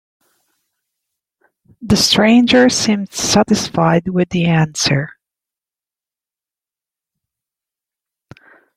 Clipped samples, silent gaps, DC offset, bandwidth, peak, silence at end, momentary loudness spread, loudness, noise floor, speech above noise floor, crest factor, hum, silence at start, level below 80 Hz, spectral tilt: under 0.1%; none; under 0.1%; 15.5 kHz; 0 dBFS; 3.65 s; 8 LU; -13 LUFS; -90 dBFS; 76 dB; 18 dB; none; 1.8 s; -48 dBFS; -4.5 dB/octave